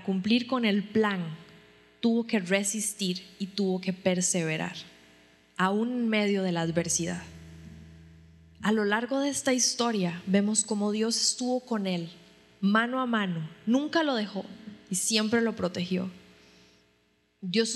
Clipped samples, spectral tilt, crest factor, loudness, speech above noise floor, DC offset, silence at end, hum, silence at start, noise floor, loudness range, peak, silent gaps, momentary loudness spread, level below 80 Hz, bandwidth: under 0.1%; -4 dB/octave; 22 dB; -28 LUFS; 41 dB; under 0.1%; 0 s; none; 0 s; -69 dBFS; 3 LU; -8 dBFS; none; 14 LU; -66 dBFS; 13 kHz